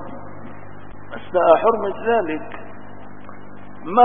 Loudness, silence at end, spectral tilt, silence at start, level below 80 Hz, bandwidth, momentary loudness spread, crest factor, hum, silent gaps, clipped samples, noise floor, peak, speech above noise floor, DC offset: -19 LUFS; 0 s; -10.5 dB/octave; 0 s; -52 dBFS; 3.7 kHz; 25 LU; 20 dB; 50 Hz at -50 dBFS; none; under 0.1%; -40 dBFS; 0 dBFS; 23 dB; 3%